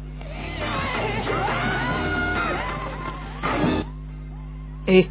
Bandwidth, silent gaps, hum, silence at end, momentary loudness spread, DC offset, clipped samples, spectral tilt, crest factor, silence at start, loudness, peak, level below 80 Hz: 4 kHz; none; none; 0 s; 14 LU; under 0.1%; under 0.1%; -10 dB/octave; 22 dB; 0 s; -25 LUFS; -4 dBFS; -36 dBFS